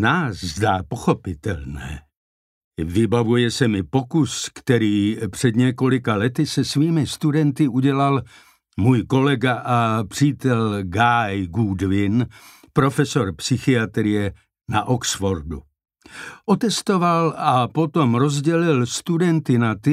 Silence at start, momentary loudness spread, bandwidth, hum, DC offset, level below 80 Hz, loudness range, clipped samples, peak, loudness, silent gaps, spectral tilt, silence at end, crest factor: 0 s; 9 LU; 15 kHz; none; under 0.1%; -46 dBFS; 3 LU; under 0.1%; -4 dBFS; -20 LUFS; 2.16-2.71 s; -6 dB/octave; 0 s; 16 dB